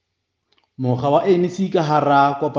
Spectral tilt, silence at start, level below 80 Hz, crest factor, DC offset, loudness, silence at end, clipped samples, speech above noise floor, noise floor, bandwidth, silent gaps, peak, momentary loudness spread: -7.5 dB/octave; 0.8 s; -62 dBFS; 16 dB; under 0.1%; -18 LUFS; 0 s; under 0.1%; 58 dB; -75 dBFS; 7.4 kHz; none; -2 dBFS; 6 LU